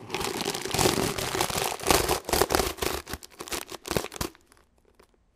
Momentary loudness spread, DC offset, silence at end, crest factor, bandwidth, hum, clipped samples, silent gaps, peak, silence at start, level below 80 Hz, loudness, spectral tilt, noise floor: 11 LU; under 0.1%; 1.05 s; 28 dB; 16 kHz; none; under 0.1%; none; -2 dBFS; 0 s; -44 dBFS; -27 LUFS; -3 dB/octave; -61 dBFS